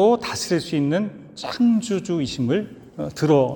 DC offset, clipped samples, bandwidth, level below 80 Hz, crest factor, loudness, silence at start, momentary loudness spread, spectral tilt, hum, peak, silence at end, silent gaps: under 0.1%; under 0.1%; 18 kHz; -56 dBFS; 16 dB; -22 LUFS; 0 s; 13 LU; -6 dB/octave; none; -4 dBFS; 0 s; none